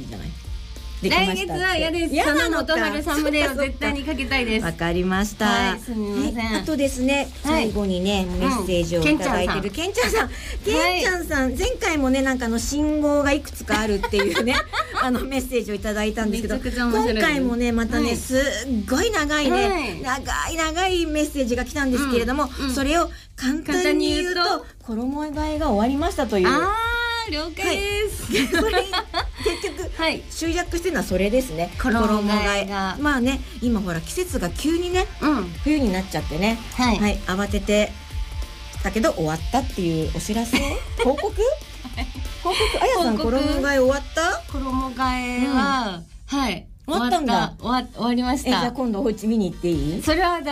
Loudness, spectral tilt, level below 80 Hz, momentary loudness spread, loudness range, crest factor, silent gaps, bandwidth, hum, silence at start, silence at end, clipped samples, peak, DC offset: -22 LUFS; -4.5 dB/octave; -34 dBFS; 7 LU; 2 LU; 14 dB; none; 15.5 kHz; none; 0 s; 0 s; under 0.1%; -8 dBFS; under 0.1%